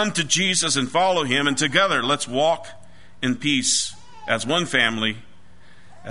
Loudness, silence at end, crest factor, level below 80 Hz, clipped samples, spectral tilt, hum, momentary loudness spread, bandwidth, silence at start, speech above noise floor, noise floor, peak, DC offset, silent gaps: -20 LUFS; 0 s; 20 dB; -58 dBFS; under 0.1%; -2.5 dB/octave; none; 10 LU; 11 kHz; 0 s; 30 dB; -52 dBFS; -2 dBFS; 1%; none